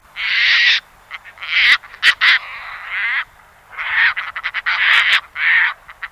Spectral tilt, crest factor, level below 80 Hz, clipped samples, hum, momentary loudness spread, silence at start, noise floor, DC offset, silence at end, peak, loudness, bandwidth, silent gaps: 2 dB/octave; 18 dB; -56 dBFS; under 0.1%; 50 Hz at -65 dBFS; 19 LU; 0.15 s; -45 dBFS; under 0.1%; 0.05 s; 0 dBFS; -14 LUFS; 16 kHz; none